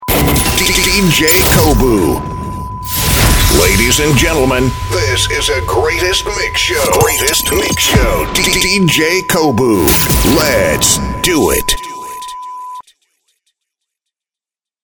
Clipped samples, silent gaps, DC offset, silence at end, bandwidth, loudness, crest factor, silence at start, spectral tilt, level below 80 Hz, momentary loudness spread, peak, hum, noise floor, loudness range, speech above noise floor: under 0.1%; none; under 0.1%; 2.05 s; over 20 kHz; -10 LUFS; 12 dB; 0 s; -3.5 dB/octave; -22 dBFS; 11 LU; 0 dBFS; none; -89 dBFS; 5 LU; 78 dB